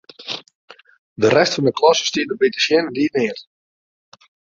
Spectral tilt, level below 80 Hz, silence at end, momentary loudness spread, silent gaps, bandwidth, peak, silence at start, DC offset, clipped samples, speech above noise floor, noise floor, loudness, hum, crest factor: -4 dB/octave; -62 dBFS; 1.2 s; 14 LU; 0.55-0.68 s, 0.99-1.16 s; 7.6 kHz; -2 dBFS; 0.2 s; under 0.1%; under 0.1%; over 73 dB; under -90 dBFS; -18 LUFS; none; 18 dB